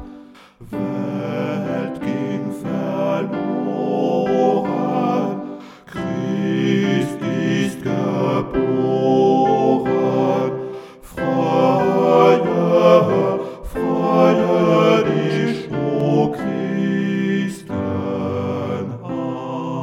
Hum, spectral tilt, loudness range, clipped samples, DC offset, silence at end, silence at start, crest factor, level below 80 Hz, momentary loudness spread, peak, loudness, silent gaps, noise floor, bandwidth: none; -7.5 dB/octave; 7 LU; under 0.1%; under 0.1%; 0 s; 0 s; 18 dB; -48 dBFS; 11 LU; 0 dBFS; -19 LUFS; none; -41 dBFS; 15 kHz